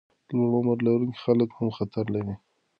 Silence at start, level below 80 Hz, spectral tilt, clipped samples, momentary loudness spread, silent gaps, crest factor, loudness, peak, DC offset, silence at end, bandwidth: 0.3 s; -58 dBFS; -10.5 dB/octave; under 0.1%; 8 LU; none; 18 dB; -26 LUFS; -8 dBFS; under 0.1%; 0.45 s; 5.4 kHz